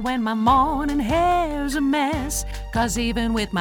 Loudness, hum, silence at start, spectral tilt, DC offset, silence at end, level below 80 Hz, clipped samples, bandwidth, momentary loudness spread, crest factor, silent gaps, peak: -22 LUFS; none; 0 s; -4.5 dB/octave; under 0.1%; 0 s; -32 dBFS; under 0.1%; 20 kHz; 7 LU; 16 dB; none; -6 dBFS